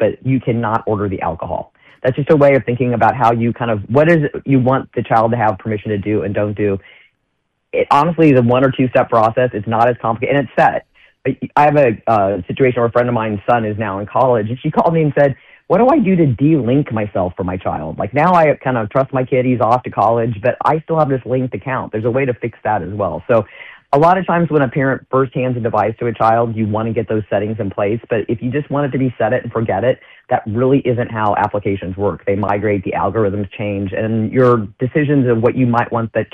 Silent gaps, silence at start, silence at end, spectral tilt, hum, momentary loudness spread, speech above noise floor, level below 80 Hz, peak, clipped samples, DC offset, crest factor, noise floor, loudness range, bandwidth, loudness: none; 0 s; 0.1 s; -9.5 dB/octave; none; 8 LU; 54 dB; -46 dBFS; 0 dBFS; under 0.1%; under 0.1%; 16 dB; -69 dBFS; 3 LU; 7.8 kHz; -16 LUFS